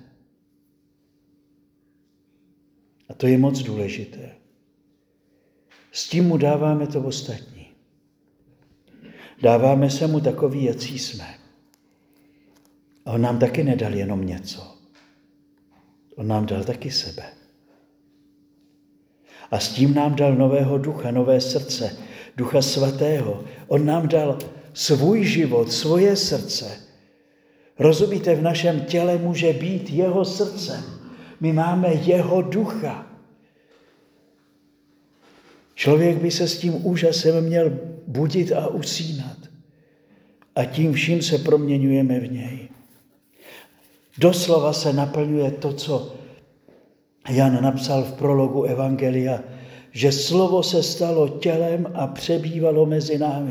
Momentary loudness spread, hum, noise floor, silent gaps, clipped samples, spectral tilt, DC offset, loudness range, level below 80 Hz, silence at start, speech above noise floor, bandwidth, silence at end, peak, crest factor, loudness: 14 LU; none; -64 dBFS; none; under 0.1%; -6 dB/octave; under 0.1%; 7 LU; -62 dBFS; 3.1 s; 44 dB; over 20 kHz; 0 s; -2 dBFS; 20 dB; -21 LUFS